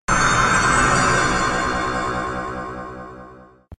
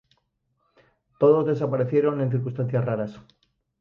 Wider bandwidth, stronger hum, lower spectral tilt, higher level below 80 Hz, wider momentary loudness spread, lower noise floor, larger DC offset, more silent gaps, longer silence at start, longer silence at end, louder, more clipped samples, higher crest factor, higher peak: first, 12.5 kHz vs 5.6 kHz; neither; second, -3.5 dB/octave vs -10.5 dB/octave; first, -34 dBFS vs -64 dBFS; first, 17 LU vs 8 LU; second, -43 dBFS vs -73 dBFS; neither; neither; second, 0.1 s vs 1.2 s; second, 0.05 s vs 0.6 s; first, -18 LUFS vs -23 LUFS; neither; about the same, 16 dB vs 18 dB; about the same, -4 dBFS vs -6 dBFS